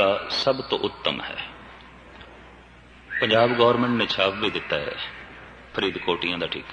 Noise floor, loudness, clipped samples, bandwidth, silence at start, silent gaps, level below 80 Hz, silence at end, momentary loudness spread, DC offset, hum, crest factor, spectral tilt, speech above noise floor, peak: -48 dBFS; -24 LUFS; under 0.1%; 9.6 kHz; 0 s; none; -54 dBFS; 0 s; 23 LU; under 0.1%; none; 20 dB; -5 dB/octave; 25 dB; -4 dBFS